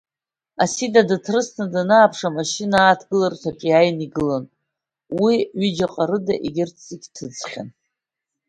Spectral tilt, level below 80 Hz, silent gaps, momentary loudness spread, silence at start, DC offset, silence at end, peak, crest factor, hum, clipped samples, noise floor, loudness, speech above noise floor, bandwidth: -4.5 dB/octave; -58 dBFS; none; 16 LU; 0.6 s; under 0.1%; 0.8 s; 0 dBFS; 20 dB; none; under 0.1%; -89 dBFS; -19 LUFS; 70 dB; 11 kHz